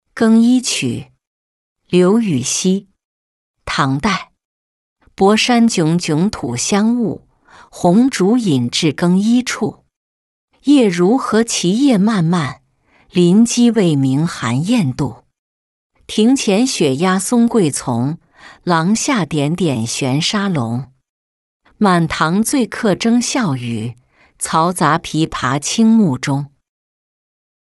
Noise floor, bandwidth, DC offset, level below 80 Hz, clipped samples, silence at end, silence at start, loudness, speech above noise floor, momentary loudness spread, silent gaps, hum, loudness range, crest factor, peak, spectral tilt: -54 dBFS; 12 kHz; under 0.1%; -50 dBFS; under 0.1%; 1.15 s; 0.15 s; -15 LUFS; 40 dB; 10 LU; 1.27-1.76 s, 3.05-3.54 s, 4.45-4.96 s, 9.96-10.48 s, 15.39-15.90 s, 21.09-21.60 s; none; 3 LU; 14 dB; -2 dBFS; -5 dB/octave